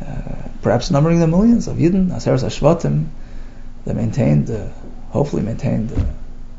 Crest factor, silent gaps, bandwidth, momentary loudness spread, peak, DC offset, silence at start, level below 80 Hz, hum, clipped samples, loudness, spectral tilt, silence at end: 18 dB; none; 7.8 kHz; 16 LU; 0 dBFS; under 0.1%; 0 s; -28 dBFS; none; under 0.1%; -18 LUFS; -7.5 dB/octave; 0 s